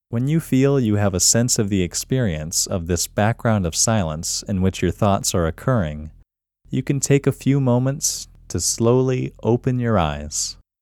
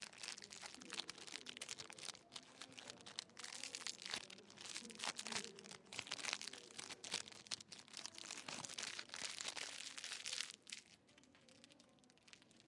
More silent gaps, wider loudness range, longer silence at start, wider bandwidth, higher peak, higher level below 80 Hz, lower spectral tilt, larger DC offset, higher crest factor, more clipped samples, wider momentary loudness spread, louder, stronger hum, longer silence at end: neither; about the same, 3 LU vs 3 LU; about the same, 0.1 s vs 0 s; first, 18 kHz vs 12 kHz; first, -4 dBFS vs -20 dBFS; first, -40 dBFS vs under -90 dBFS; first, -4.5 dB/octave vs 0 dB/octave; neither; second, 16 dB vs 32 dB; neither; second, 6 LU vs 19 LU; first, -20 LUFS vs -49 LUFS; neither; first, 0.3 s vs 0 s